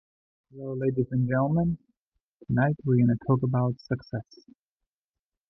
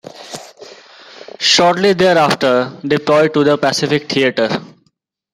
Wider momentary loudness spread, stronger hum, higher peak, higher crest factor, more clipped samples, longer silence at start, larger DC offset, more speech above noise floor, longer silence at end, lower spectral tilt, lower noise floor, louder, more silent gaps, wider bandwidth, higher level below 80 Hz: about the same, 14 LU vs 15 LU; neither; second, -12 dBFS vs 0 dBFS; about the same, 16 dB vs 16 dB; neither; first, 0.55 s vs 0.15 s; neither; first, over 64 dB vs 50 dB; first, 1.25 s vs 0.65 s; first, -11 dB/octave vs -4 dB/octave; first, under -90 dBFS vs -63 dBFS; second, -26 LUFS vs -13 LUFS; first, 1.97-2.12 s, 2.20-2.39 s vs none; second, 5.8 kHz vs 16 kHz; about the same, -56 dBFS vs -56 dBFS